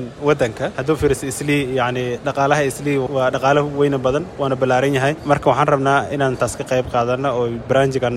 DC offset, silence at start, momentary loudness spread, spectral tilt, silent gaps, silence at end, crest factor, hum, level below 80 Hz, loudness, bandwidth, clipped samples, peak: under 0.1%; 0 s; 5 LU; -5.5 dB/octave; none; 0 s; 16 dB; none; -42 dBFS; -18 LUFS; 15 kHz; under 0.1%; -2 dBFS